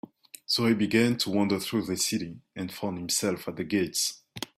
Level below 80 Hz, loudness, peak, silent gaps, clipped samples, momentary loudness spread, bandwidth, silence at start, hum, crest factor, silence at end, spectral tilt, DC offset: -64 dBFS; -27 LUFS; -10 dBFS; none; under 0.1%; 14 LU; 16 kHz; 0.5 s; none; 18 dB; 0.15 s; -3.5 dB/octave; under 0.1%